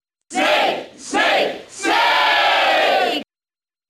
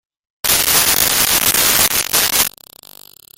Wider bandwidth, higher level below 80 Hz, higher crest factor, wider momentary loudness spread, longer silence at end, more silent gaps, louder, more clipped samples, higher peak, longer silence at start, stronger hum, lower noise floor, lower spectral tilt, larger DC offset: second, 15 kHz vs over 20 kHz; second, -62 dBFS vs -42 dBFS; about the same, 12 dB vs 16 dB; first, 10 LU vs 5 LU; second, 0.65 s vs 0.9 s; neither; second, -17 LUFS vs -12 LUFS; second, under 0.1% vs 0.1%; second, -6 dBFS vs 0 dBFS; second, 0.3 s vs 0.45 s; neither; first, under -90 dBFS vs -41 dBFS; about the same, -1 dB/octave vs 0 dB/octave; neither